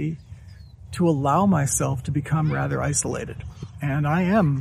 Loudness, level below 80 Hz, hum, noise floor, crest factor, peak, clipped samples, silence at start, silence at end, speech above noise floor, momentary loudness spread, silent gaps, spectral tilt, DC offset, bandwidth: -23 LUFS; -44 dBFS; none; -43 dBFS; 16 dB; -8 dBFS; under 0.1%; 0 s; 0 s; 21 dB; 17 LU; none; -6 dB/octave; under 0.1%; 15 kHz